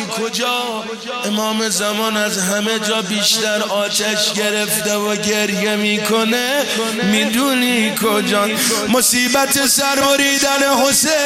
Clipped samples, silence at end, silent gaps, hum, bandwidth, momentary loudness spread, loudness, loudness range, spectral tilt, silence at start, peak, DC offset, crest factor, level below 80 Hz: under 0.1%; 0 s; none; none; 16 kHz; 5 LU; -15 LUFS; 3 LU; -2 dB/octave; 0 s; -2 dBFS; under 0.1%; 14 dB; -56 dBFS